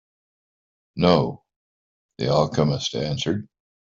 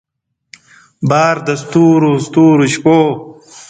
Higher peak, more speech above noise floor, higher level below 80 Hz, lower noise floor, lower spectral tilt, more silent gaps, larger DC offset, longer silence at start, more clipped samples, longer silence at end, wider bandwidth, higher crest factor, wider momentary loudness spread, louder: about the same, -2 dBFS vs 0 dBFS; first, over 69 dB vs 34 dB; about the same, -52 dBFS vs -54 dBFS; first, under -90 dBFS vs -44 dBFS; about the same, -6 dB/octave vs -6.5 dB/octave; first, 1.56-2.09 s vs none; neither; about the same, 0.95 s vs 1 s; neither; first, 0.4 s vs 0.1 s; second, 7.6 kHz vs 9.2 kHz; first, 22 dB vs 12 dB; first, 11 LU vs 8 LU; second, -23 LUFS vs -11 LUFS